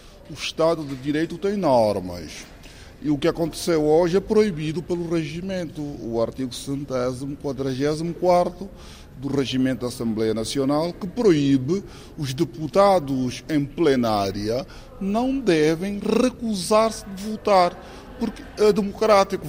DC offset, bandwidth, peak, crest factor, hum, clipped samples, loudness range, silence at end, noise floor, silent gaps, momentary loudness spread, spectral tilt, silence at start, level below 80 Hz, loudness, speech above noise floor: under 0.1%; 16 kHz; -4 dBFS; 18 dB; none; under 0.1%; 3 LU; 0 s; -42 dBFS; none; 13 LU; -6 dB/octave; 0.05 s; -46 dBFS; -22 LUFS; 20 dB